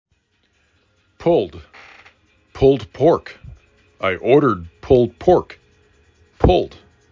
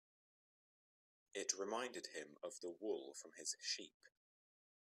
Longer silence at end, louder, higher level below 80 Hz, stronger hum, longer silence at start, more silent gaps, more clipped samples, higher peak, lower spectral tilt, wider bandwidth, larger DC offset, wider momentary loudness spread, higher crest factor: second, 0.45 s vs 0.9 s; first, -17 LUFS vs -47 LUFS; first, -34 dBFS vs under -90 dBFS; neither; second, 1.2 s vs 1.35 s; second, none vs 3.94-4.00 s; neither; first, -2 dBFS vs -24 dBFS; first, -8 dB/octave vs -0.5 dB/octave; second, 7.2 kHz vs 14.5 kHz; neither; first, 13 LU vs 10 LU; second, 18 dB vs 26 dB